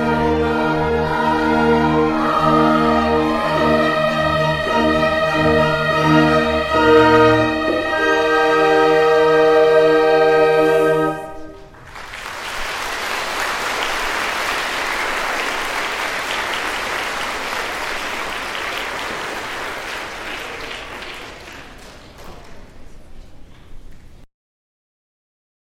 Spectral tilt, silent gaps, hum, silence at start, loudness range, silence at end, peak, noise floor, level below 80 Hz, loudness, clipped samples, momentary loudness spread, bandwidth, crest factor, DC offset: -5 dB/octave; none; none; 0 s; 13 LU; 1.45 s; 0 dBFS; -39 dBFS; -38 dBFS; -17 LUFS; under 0.1%; 14 LU; 16 kHz; 18 dB; under 0.1%